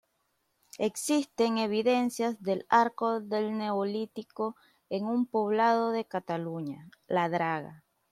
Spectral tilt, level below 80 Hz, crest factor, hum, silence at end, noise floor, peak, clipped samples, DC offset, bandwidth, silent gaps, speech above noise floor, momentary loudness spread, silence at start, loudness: -5 dB/octave; -78 dBFS; 20 dB; none; 0.35 s; -76 dBFS; -10 dBFS; under 0.1%; under 0.1%; 14.5 kHz; none; 47 dB; 11 LU; 0.75 s; -30 LUFS